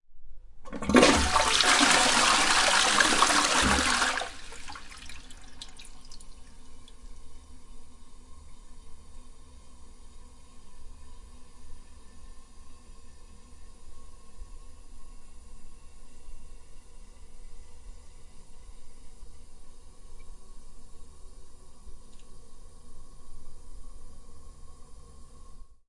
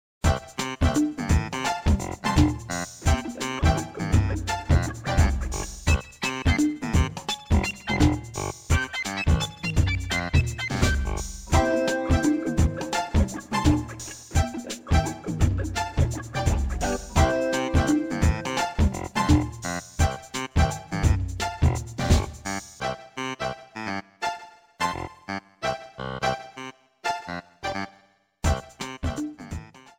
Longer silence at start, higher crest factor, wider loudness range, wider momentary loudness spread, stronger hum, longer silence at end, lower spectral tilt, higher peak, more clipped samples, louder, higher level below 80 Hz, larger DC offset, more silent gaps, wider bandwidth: second, 0.1 s vs 0.25 s; first, 26 dB vs 18 dB; first, 28 LU vs 7 LU; first, 26 LU vs 10 LU; neither; about the same, 0.15 s vs 0.2 s; second, -1.5 dB/octave vs -5.5 dB/octave; about the same, -4 dBFS vs -6 dBFS; neither; first, -22 LUFS vs -26 LUFS; second, -44 dBFS vs -30 dBFS; neither; neither; second, 11.5 kHz vs 16 kHz